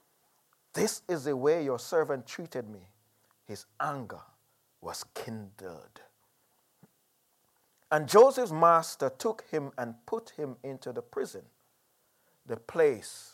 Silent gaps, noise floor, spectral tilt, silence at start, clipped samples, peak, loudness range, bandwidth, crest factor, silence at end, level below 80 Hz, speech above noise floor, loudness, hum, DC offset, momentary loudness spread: none; -72 dBFS; -4.5 dB/octave; 0.75 s; under 0.1%; -8 dBFS; 17 LU; 16.5 kHz; 24 dB; 0.05 s; -80 dBFS; 43 dB; -30 LUFS; none; under 0.1%; 23 LU